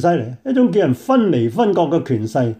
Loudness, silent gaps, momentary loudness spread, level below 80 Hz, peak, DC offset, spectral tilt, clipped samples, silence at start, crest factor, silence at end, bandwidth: -17 LUFS; none; 5 LU; -60 dBFS; -4 dBFS; under 0.1%; -8 dB/octave; under 0.1%; 0 s; 12 dB; 0.05 s; 14.5 kHz